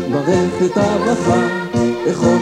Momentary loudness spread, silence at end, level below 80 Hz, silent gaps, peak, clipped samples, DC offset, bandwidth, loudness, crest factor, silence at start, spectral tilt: 3 LU; 0 s; -44 dBFS; none; -2 dBFS; under 0.1%; under 0.1%; 11.5 kHz; -16 LUFS; 14 dB; 0 s; -6 dB/octave